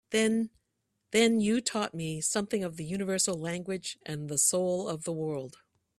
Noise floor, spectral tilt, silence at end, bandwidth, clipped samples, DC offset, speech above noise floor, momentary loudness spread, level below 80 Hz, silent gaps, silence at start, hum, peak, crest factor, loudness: -80 dBFS; -3.5 dB/octave; 0.5 s; 14 kHz; under 0.1%; under 0.1%; 50 dB; 11 LU; -68 dBFS; none; 0.1 s; none; -12 dBFS; 20 dB; -30 LUFS